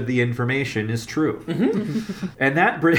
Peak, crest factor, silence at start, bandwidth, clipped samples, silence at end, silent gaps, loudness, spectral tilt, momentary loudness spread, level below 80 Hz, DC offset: -4 dBFS; 16 dB; 0 s; 18.5 kHz; under 0.1%; 0 s; none; -22 LUFS; -6.5 dB/octave; 8 LU; -56 dBFS; under 0.1%